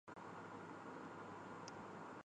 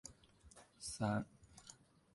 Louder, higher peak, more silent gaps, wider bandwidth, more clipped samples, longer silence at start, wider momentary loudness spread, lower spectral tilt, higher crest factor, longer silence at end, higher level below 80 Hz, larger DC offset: second, -54 LUFS vs -43 LUFS; second, -34 dBFS vs -24 dBFS; neither; second, 9.6 kHz vs 11.5 kHz; neither; about the same, 0.05 s vs 0.05 s; second, 1 LU vs 23 LU; about the same, -5.5 dB/octave vs -5 dB/octave; about the same, 20 dB vs 22 dB; second, 0 s vs 0.4 s; second, -82 dBFS vs -68 dBFS; neither